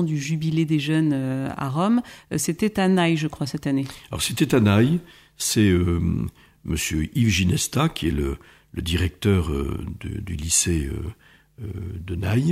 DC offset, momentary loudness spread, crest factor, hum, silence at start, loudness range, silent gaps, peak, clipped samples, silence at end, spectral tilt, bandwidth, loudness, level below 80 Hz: under 0.1%; 13 LU; 16 dB; none; 0 s; 3 LU; none; -6 dBFS; under 0.1%; 0 s; -5 dB/octave; 16 kHz; -23 LUFS; -38 dBFS